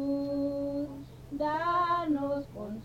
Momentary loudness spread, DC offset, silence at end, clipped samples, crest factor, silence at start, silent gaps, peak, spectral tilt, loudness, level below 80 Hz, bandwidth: 12 LU; under 0.1%; 0 s; under 0.1%; 12 dB; 0 s; none; -18 dBFS; -7 dB/octave; -31 LUFS; -56 dBFS; 14.5 kHz